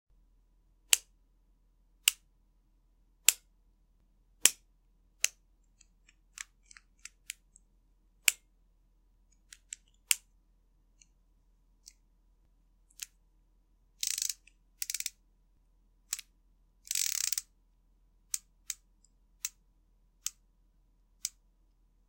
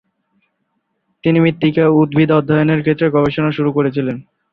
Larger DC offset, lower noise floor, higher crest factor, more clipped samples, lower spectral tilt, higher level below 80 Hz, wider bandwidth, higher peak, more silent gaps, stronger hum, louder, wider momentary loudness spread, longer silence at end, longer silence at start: neither; about the same, -68 dBFS vs -69 dBFS; first, 40 dB vs 14 dB; neither; second, 3.5 dB/octave vs -10 dB/octave; second, -68 dBFS vs -50 dBFS; first, 17 kHz vs 5 kHz; about the same, 0 dBFS vs -2 dBFS; neither; neither; second, -32 LUFS vs -15 LUFS; first, 21 LU vs 8 LU; first, 0.8 s vs 0.3 s; second, 0.9 s vs 1.25 s